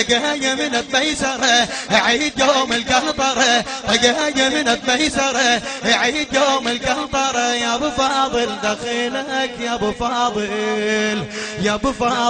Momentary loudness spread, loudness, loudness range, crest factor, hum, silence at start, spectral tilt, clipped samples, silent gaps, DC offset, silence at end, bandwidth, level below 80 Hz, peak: 6 LU; -17 LUFS; 4 LU; 18 dB; none; 0 s; -2 dB/octave; under 0.1%; none; under 0.1%; 0 s; 10 kHz; -44 dBFS; 0 dBFS